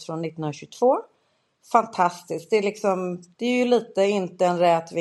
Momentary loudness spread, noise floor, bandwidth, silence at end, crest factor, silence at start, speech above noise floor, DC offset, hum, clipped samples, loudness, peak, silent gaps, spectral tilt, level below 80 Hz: 11 LU; -68 dBFS; 12.5 kHz; 0 s; 20 dB; 0 s; 45 dB; under 0.1%; none; under 0.1%; -23 LUFS; -4 dBFS; none; -5.5 dB/octave; -76 dBFS